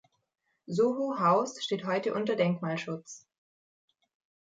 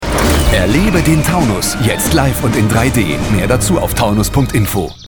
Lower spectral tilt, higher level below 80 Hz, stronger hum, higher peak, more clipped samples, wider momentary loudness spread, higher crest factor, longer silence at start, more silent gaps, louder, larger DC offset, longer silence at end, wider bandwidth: about the same, -5.5 dB/octave vs -5 dB/octave; second, -80 dBFS vs -22 dBFS; neither; second, -12 dBFS vs 0 dBFS; neither; first, 13 LU vs 3 LU; first, 18 dB vs 12 dB; first, 0.7 s vs 0 s; neither; second, -30 LUFS vs -13 LUFS; neither; first, 1.25 s vs 0 s; second, 9.2 kHz vs 19.5 kHz